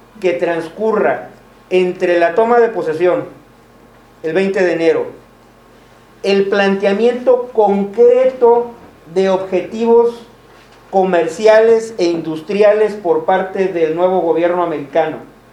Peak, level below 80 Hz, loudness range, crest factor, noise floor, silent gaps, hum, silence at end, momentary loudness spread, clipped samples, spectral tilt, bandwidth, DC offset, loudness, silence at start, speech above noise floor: 0 dBFS; -56 dBFS; 4 LU; 14 dB; -44 dBFS; none; none; 0.25 s; 9 LU; under 0.1%; -6 dB/octave; 10.5 kHz; under 0.1%; -14 LUFS; 0.2 s; 31 dB